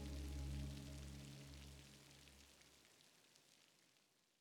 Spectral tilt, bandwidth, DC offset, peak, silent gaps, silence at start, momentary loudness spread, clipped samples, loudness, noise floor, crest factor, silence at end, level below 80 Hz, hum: -5 dB/octave; 19 kHz; under 0.1%; -38 dBFS; none; 0 s; 19 LU; under 0.1%; -55 LUFS; -79 dBFS; 18 dB; 0.4 s; -58 dBFS; none